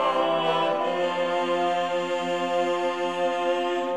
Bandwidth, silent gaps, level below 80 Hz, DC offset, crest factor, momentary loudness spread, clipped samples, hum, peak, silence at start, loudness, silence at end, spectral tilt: 11.5 kHz; none; -70 dBFS; 0.2%; 14 dB; 3 LU; under 0.1%; none; -12 dBFS; 0 s; -25 LUFS; 0 s; -4.5 dB/octave